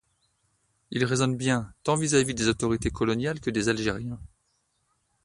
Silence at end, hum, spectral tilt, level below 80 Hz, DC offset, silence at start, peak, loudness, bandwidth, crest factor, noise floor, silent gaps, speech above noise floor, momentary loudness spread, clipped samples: 1 s; none; -4.5 dB/octave; -48 dBFS; under 0.1%; 0.9 s; -8 dBFS; -26 LUFS; 11.5 kHz; 20 dB; -73 dBFS; none; 47 dB; 9 LU; under 0.1%